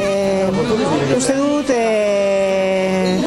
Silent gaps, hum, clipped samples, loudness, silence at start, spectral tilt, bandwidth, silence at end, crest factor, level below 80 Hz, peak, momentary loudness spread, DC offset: none; none; under 0.1%; -16 LUFS; 0 s; -5 dB/octave; 13 kHz; 0 s; 12 dB; -46 dBFS; -4 dBFS; 1 LU; under 0.1%